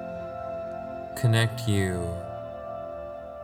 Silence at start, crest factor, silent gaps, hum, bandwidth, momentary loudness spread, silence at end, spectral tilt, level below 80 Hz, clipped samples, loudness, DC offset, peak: 0 s; 22 dB; none; none; 16.5 kHz; 13 LU; 0 s; -6 dB/octave; -52 dBFS; under 0.1%; -30 LUFS; under 0.1%; -8 dBFS